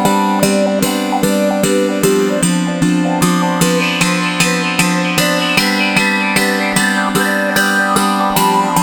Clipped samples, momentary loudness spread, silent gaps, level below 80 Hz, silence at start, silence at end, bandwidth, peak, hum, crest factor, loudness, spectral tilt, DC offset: under 0.1%; 2 LU; none; -44 dBFS; 0 s; 0 s; over 20 kHz; 0 dBFS; none; 14 dB; -13 LUFS; -4 dB/octave; under 0.1%